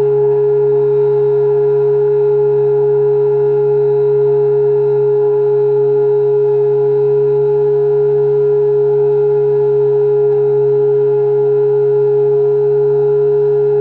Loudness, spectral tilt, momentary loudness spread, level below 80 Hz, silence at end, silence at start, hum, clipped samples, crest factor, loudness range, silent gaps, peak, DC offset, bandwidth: -12 LUFS; -11 dB/octave; 0 LU; -62 dBFS; 0 s; 0 s; none; under 0.1%; 6 dB; 0 LU; none; -6 dBFS; under 0.1%; 2.8 kHz